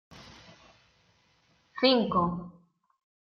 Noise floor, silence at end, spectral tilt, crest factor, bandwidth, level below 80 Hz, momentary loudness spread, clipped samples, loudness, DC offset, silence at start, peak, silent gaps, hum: -68 dBFS; 0.75 s; -7 dB/octave; 24 dB; 6.8 kHz; -62 dBFS; 26 LU; under 0.1%; -27 LUFS; under 0.1%; 0.15 s; -8 dBFS; none; none